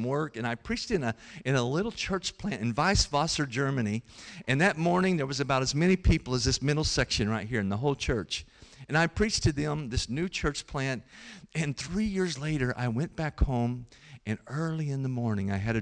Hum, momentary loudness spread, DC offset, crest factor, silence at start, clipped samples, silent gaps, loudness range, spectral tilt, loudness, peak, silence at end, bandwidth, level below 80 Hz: none; 9 LU; under 0.1%; 14 dB; 0 s; under 0.1%; none; 5 LU; -5 dB/octave; -29 LUFS; -14 dBFS; 0 s; 10.5 kHz; -40 dBFS